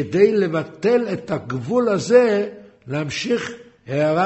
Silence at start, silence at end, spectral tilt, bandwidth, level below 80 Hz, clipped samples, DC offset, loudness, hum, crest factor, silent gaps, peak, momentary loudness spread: 0 s; 0 s; -6 dB/octave; 8.2 kHz; -60 dBFS; under 0.1%; under 0.1%; -20 LUFS; none; 16 dB; none; -2 dBFS; 12 LU